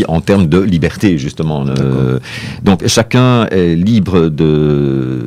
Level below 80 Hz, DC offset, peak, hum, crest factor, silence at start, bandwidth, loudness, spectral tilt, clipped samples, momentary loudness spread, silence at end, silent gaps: -34 dBFS; under 0.1%; 0 dBFS; none; 12 dB; 0 s; 15 kHz; -12 LUFS; -6.5 dB/octave; under 0.1%; 6 LU; 0 s; none